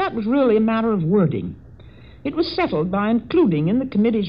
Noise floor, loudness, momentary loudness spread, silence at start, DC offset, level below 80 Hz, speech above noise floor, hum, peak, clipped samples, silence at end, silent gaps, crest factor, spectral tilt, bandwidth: -43 dBFS; -19 LUFS; 9 LU; 0 s; 0.3%; -48 dBFS; 24 dB; none; -6 dBFS; under 0.1%; 0 s; none; 14 dB; -10 dB/octave; 5.4 kHz